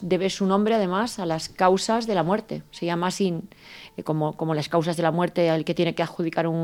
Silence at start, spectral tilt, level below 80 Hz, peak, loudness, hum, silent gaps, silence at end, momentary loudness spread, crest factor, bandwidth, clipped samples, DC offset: 0 s; -5.5 dB/octave; -60 dBFS; -6 dBFS; -24 LUFS; none; none; 0 s; 9 LU; 18 dB; 16 kHz; under 0.1%; under 0.1%